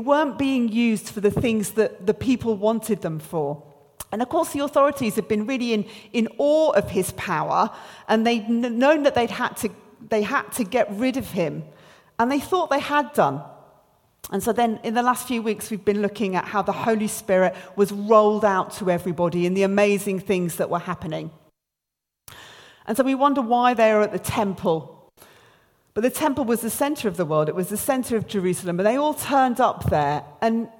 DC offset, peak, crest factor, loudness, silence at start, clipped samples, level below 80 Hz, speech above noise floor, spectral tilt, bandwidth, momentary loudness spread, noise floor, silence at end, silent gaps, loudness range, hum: under 0.1%; -4 dBFS; 20 dB; -22 LUFS; 0 s; under 0.1%; -54 dBFS; 62 dB; -5 dB/octave; 17.5 kHz; 9 LU; -84 dBFS; 0.1 s; none; 4 LU; none